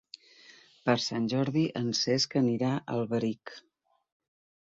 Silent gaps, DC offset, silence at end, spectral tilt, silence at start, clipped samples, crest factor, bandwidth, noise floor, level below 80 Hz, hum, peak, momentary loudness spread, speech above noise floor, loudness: none; under 0.1%; 1.1 s; -5 dB/octave; 0.85 s; under 0.1%; 20 dB; 7.8 kHz; -57 dBFS; -70 dBFS; none; -12 dBFS; 15 LU; 28 dB; -29 LUFS